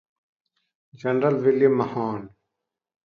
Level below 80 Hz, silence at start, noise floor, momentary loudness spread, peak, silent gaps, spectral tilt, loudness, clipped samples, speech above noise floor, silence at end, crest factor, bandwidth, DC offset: -68 dBFS; 1.05 s; -84 dBFS; 12 LU; -6 dBFS; none; -9 dB/octave; -22 LUFS; under 0.1%; 62 dB; 0.75 s; 18 dB; 6.4 kHz; under 0.1%